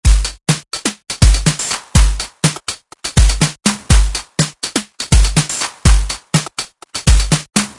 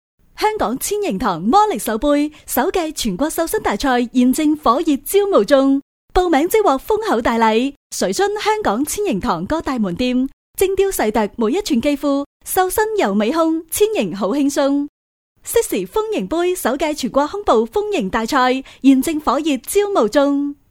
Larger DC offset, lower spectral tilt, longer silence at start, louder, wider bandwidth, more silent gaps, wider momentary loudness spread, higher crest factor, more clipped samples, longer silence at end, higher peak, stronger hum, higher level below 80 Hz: neither; about the same, -3.5 dB/octave vs -4 dB/octave; second, 0.05 s vs 0.4 s; about the same, -16 LUFS vs -17 LUFS; second, 11.5 kHz vs 17.5 kHz; second, none vs 5.82-6.08 s, 7.76-7.90 s, 10.33-10.54 s, 12.26-12.40 s, 14.89-15.35 s; about the same, 8 LU vs 6 LU; about the same, 14 dB vs 18 dB; neither; about the same, 0.05 s vs 0.15 s; about the same, 0 dBFS vs 0 dBFS; neither; first, -16 dBFS vs -40 dBFS